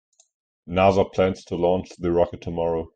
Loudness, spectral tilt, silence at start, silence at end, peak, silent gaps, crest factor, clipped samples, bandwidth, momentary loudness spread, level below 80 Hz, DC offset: -23 LUFS; -7 dB/octave; 0.65 s; 0.1 s; -6 dBFS; none; 18 dB; under 0.1%; 8.8 kHz; 7 LU; -48 dBFS; under 0.1%